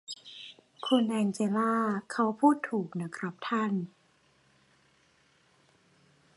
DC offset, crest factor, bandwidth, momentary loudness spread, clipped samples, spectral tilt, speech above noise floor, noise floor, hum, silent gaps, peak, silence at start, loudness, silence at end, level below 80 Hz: under 0.1%; 20 dB; 11.5 kHz; 17 LU; under 0.1%; -5.5 dB/octave; 38 dB; -67 dBFS; none; none; -12 dBFS; 0.1 s; -30 LUFS; 2.5 s; -80 dBFS